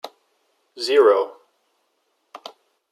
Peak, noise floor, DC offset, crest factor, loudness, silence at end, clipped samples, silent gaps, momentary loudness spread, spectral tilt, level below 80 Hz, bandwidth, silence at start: -4 dBFS; -70 dBFS; under 0.1%; 20 dB; -18 LUFS; 1.6 s; under 0.1%; none; 25 LU; -1.5 dB/octave; -90 dBFS; 13 kHz; 0.05 s